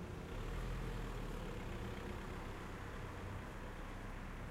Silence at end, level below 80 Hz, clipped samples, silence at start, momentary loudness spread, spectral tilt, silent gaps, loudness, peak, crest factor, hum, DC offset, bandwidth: 0 s; -48 dBFS; under 0.1%; 0 s; 4 LU; -6 dB/octave; none; -48 LUFS; -32 dBFS; 12 dB; none; under 0.1%; 16 kHz